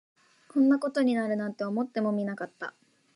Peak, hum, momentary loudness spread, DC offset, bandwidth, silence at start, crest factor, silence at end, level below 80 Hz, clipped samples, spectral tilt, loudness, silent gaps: -14 dBFS; none; 13 LU; under 0.1%; 11 kHz; 0.55 s; 14 dB; 0.45 s; -82 dBFS; under 0.1%; -7 dB/octave; -28 LUFS; none